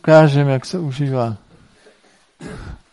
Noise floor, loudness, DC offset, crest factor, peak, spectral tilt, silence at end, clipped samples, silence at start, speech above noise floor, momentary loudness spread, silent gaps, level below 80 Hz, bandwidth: -54 dBFS; -16 LUFS; under 0.1%; 18 dB; 0 dBFS; -7.5 dB/octave; 0.15 s; under 0.1%; 0.05 s; 40 dB; 25 LU; none; -46 dBFS; 11.5 kHz